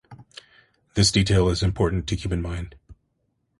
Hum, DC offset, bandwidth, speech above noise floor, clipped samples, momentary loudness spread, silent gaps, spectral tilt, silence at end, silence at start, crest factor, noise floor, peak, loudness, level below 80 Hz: none; under 0.1%; 11.5 kHz; 50 dB; under 0.1%; 20 LU; none; -5 dB/octave; 0.65 s; 0.1 s; 18 dB; -72 dBFS; -6 dBFS; -23 LUFS; -36 dBFS